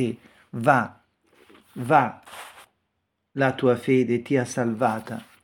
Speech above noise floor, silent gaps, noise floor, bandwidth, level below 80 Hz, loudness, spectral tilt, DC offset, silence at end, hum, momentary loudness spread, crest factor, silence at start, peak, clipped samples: 54 dB; none; -77 dBFS; 18 kHz; -68 dBFS; -23 LUFS; -6.5 dB/octave; under 0.1%; 0.2 s; none; 20 LU; 22 dB; 0 s; -2 dBFS; under 0.1%